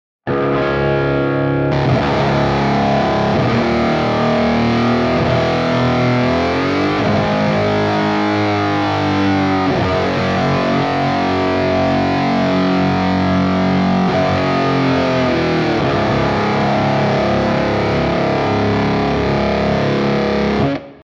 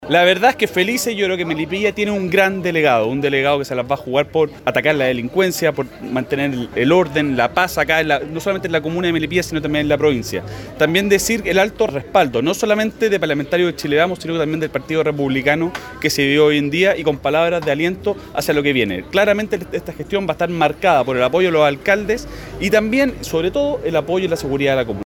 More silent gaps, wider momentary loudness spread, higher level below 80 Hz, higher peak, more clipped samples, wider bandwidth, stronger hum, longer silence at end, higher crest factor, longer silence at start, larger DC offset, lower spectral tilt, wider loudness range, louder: neither; second, 1 LU vs 7 LU; first, -36 dBFS vs -44 dBFS; second, -4 dBFS vs 0 dBFS; neither; second, 7.6 kHz vs 17.5 kHz; neither; about the same, 0.1 s vs 0 s; about the same, 12 dB vs 16 dB; first, 0.25 s vs 0 s; neither; first, -7 dB/octave vs -4.5 dB/octave; about the same, 1 LU vs 2 LU; about the same, -15 LUFS vs -17 LUFS